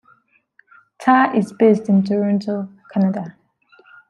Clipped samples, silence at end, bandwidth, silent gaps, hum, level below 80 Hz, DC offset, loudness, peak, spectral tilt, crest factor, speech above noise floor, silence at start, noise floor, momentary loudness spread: under 0.1%; 0.8 s; 10 kHz; none; none; -66 dBFS; under 0.1%; -18 LUFS; -2 dBFS; -8 dB/octave; 18 dB; 41 dB; 1 s; -57 dBFS; 12 LU